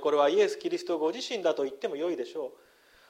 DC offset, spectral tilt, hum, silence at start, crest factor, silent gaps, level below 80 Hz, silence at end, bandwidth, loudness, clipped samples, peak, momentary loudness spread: under 0.1%; -3.5 dB/octave; none; 0 s; 16 dB; none; -80 dBFS; 0.6 s; 13 kHz; -29 LUFS; under 0.1%; -12 dBFS; 12 LU